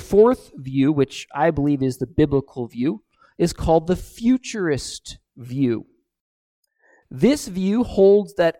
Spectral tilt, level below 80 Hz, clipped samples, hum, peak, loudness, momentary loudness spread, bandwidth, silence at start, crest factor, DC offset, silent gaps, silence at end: -6.5 dB/octave; -42 dBFS; under 0.1%; none; -4 dBFS; -20 LUFS; 16 LU; 15.5 kHz; 0 s; 18 dB; under 0.1%; 6.21-6.63 s; 0.1 s